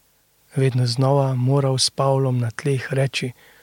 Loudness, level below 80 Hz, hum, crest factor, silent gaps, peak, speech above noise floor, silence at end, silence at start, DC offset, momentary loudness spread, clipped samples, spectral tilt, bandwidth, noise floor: -20 LUFS; -64 dBFS; none; 16 dB; none; -6 dBFS; 40 dB; 0.3 s; 0.55 s; under 0.1%; 6 LU; under 0.1%; -5.5 dB/octave; 13.5 kHz; -60 dBFS